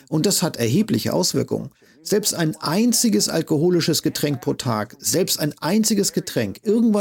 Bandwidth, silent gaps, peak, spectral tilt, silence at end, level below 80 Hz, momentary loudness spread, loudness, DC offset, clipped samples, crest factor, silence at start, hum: 17 kHz; none; -6 dBFS; -4 dB/octave; 0 s; -58 dBFS; 6 LU; -20 LUFS; under 0.1%; under 0.1%; 14 dB; 0.1 s; none